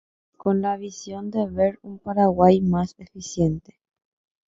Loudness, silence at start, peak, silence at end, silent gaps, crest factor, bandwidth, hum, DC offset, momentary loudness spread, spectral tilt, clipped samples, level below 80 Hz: -22 LUFS; 0.45 s; -2 dBFS; 0.9 s; none; 20 dB; 7.8 kHz; none; under 0.1%; 17 LU; -7.5 dB/octave; under 0.1%; -50 dBFS